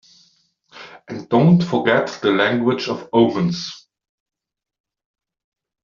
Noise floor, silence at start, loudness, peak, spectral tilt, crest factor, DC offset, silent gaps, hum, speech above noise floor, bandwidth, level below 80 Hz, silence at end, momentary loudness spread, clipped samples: -60 dBFS; 0.75 s; -18 LUFS; -2 dBFS; -5.5 dB/octave; 18 dB; under 0.1%; none; none; 43 dB; 7.2 kHz; -60 dBFS; 2.05 s; 19 LU; under 0.1%